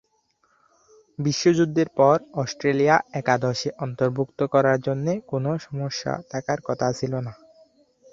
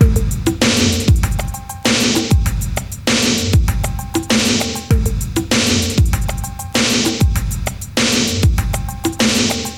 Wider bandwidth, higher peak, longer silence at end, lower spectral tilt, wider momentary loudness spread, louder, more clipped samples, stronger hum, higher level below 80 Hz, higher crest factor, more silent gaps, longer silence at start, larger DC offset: second, 7.6 kHz vs 17.5 kHz; second, -4 dBFS vs 0 dBFS; first, 0.8 s vs 0 s; first, -6 dB/octave vs -4 dB/octave; about the same, 10 LU vs 8 LU; second, -23 LUFS vs -16 LUFS; neither; neither; second, -62 dBFS vs -22 dBFS; about the same, 20 dB vs 16 dB; neither; first, 1.2 s vs 0 s; second, under 0.1% vs 0.3%